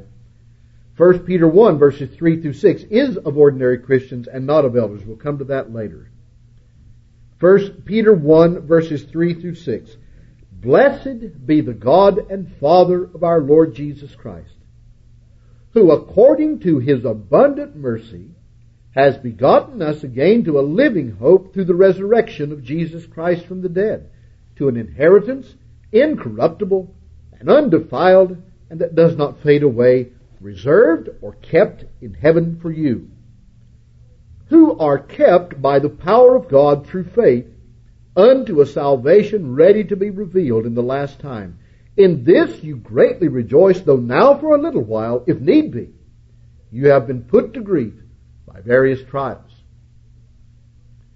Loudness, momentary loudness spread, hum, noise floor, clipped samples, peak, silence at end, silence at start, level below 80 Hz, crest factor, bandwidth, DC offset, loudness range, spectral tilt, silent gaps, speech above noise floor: -15 LUFS; 14 LU; none; -47 dBFS; under 0.1%; 0 dBFS; 1.8 s; 1 s; -46 dBFS; 16 dB; 6.4 kHz; under 0.1%; 5 LU; -9 dB/octave; none; 33 dB